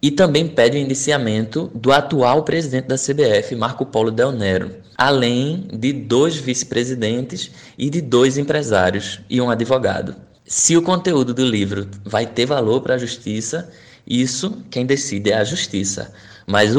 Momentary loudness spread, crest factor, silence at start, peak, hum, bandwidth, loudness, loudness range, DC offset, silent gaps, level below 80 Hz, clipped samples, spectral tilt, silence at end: 9 LU; 16 dB; 0.05 s; -2 dBFS; none; 12.5 kHz; -18 LUFS; 3 LU; under 0.1%; none; -54 dBFS; under 0.1%; -4.5 dB/octave; 0 s